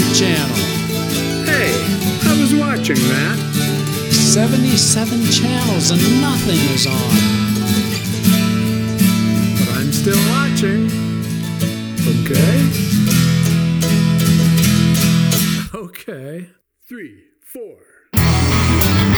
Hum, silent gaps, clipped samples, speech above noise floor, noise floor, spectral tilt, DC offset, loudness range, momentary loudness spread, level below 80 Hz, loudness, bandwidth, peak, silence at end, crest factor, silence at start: none; none; under 0.1%; 23 dB; -38 dBFS; -4.5 dB/octave; under 0.1%; 4 LU; 8 LU; -34 dBFS; -15 LUFS; over 20 kHz; 0 dBFS; 0 s; 14 dB; 0 s